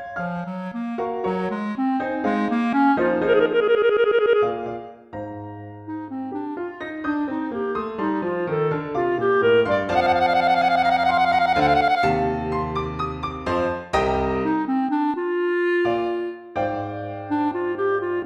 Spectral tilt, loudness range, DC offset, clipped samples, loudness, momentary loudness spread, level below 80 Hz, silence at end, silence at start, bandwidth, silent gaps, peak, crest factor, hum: -7 dB/octave; 7 LU; under 0.1%; under 0.1%; -22 LUFS; 12 LU; -46 dBFS; 0 s; 0 s; 10 kHz; none; -6 dBFS; 16 dB; none